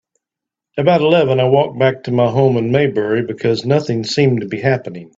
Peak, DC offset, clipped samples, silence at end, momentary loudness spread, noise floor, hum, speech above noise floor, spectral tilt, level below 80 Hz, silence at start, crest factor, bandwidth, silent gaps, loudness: 0 dBFS; under 0.1%; under 0.1%; 0.15 s; 5 LU; -84 dBFS; none; 70 dB; -7 dB/octave; -54 dBFS; 0.75 s; 14 dB; 7.8 kHz; none; -15 LUFS